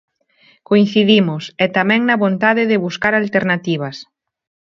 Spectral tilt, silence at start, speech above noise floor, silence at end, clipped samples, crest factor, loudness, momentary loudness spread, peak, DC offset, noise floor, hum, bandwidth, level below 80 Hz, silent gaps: -6.5 dB/octave; 0.7 s; 39 dB; 0.7 s; under 0.1%; 16 dB; -15 LUFS; 9 LU; 0 dBFS; under 0.1%; -54 dBFS; none; 7.2 kHz; -58 dBFS; none